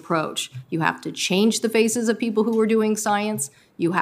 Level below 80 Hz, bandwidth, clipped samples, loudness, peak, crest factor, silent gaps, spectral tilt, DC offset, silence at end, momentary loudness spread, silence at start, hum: -74 dBFS; 16 kHz; under 0.1%; -22 LUFS; -2 dBFS; 20 dB; none; -4 dB/octave; under 0.1%; 0 s; 8 LU; 0.05 s; none